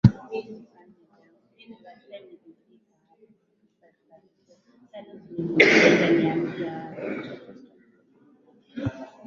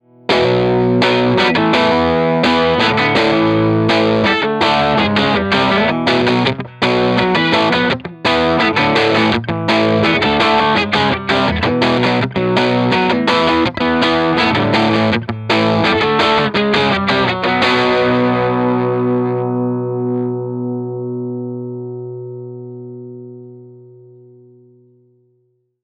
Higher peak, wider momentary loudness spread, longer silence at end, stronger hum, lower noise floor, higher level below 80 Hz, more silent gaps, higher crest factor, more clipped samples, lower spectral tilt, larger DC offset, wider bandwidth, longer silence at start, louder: about the same, 0 dBFS vs 0 dBFS; first, 29 LU vs 10 LU; second, 0.2 s vs 2.05 s; second, none vs 60 Hz at -45 dBFS; first, -68 dBFS vs -62 dBFS; second, -52 dBFS vs -42 dBFS; neither; first, 26 dB vs 14 dB; neither; about the same, -6 dB/octave vs -6 dB/octave; neither; second, 7.6 kHz vs 10.5 kHz; second, 0.05 s vs 0.3 s; second, -22 LUFS vs -14 LUFS